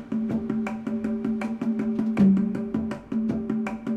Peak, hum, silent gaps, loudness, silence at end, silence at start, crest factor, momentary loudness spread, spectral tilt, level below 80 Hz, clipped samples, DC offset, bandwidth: -10 dBFS; none; none; -26 LUFS; 0 s; 0 s; 16 dB; 9 LU; -9 dB/octave; -54 dBFS; under 0.1%; under 0.1%; 8.2 kHz